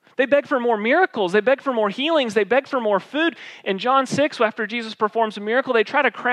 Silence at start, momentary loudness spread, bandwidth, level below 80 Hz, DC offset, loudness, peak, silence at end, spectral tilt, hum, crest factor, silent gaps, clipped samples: 0.2 s; 5 LU; 11.5 kHz; -80 dBFS; under 0.1%; -20 LUFS; -4 dBFS; 0 s; -4.5 dB/octave; none; 16 dB; none; under 0.1%